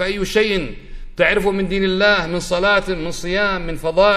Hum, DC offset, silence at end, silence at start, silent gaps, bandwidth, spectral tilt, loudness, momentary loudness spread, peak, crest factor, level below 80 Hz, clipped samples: none; under 0.1%; 0 s; 0 s; none; 15 kHz; -4.5 dB/octave; -18 LUFS; 8 LU; -2 dBFS; 16 dB; -32 dBFS; under 0.1%